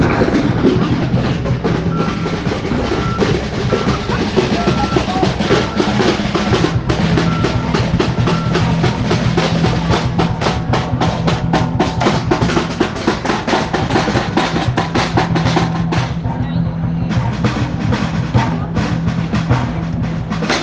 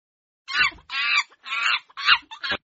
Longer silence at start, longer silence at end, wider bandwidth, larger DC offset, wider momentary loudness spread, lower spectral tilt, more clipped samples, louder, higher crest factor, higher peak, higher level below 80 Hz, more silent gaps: second, 0 s vs 0.5 s; second, 0 s vs 0.15 s; first, 9.2 kHz vs 8 kHz; neither; second, 4 LU vs 9 LU; first, -6.5 dB/octave vs 4 dB/octave; neither; first, -16 LUFS vs -22 LUFS; second, 16 dB vs 22 dB; first, 0 dBFS vs -4 dBFS; first, -30 dBFS vs -60 dBFS; neither